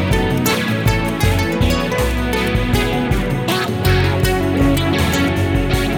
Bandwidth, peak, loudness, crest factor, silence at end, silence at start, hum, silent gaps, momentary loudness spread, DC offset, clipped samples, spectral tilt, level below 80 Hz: over 20 kHz; -4 dBFS; -17 LUFS; 12 dB; 0 s; 0 s; none; none; 3 LU; under 0.1%; under 0.1%; -5.5 dB/octave; -24 dBFS